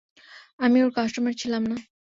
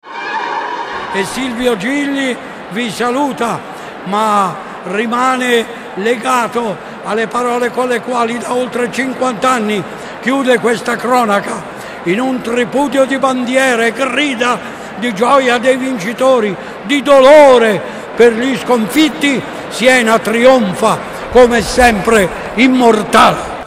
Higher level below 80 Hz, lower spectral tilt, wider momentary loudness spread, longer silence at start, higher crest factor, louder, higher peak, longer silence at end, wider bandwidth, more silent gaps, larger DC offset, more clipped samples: second, -64 dBFS vs -40 dBFS; about the same, -4.5 dB/octave vs -4 dB/octave; about the same, 9 LU vs 11 LU; first, 0.3 s vs 0.05 s; about the same, 16 dB vs 12 dB; second, -24 LUFS vs -12 LUFS; second, -10 dBFS vs 0 dBFS; first, 0.35 s vs 0 s; second, 7.6 kHz vs 16 kHz; first, 0.53-0.58 s vs none; neither; second, under 0.1% vs 0.4%